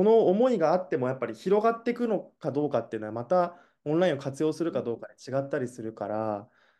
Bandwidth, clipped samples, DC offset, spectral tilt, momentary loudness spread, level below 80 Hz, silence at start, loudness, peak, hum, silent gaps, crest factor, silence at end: 11.5 kHz; under 0.1%; under 0.1%; -7 dB/octave; 12 LU; -76 dBFS; 0 s; -28 LUFS; -12 dBFS; none; none; 16 dB; 0.35 s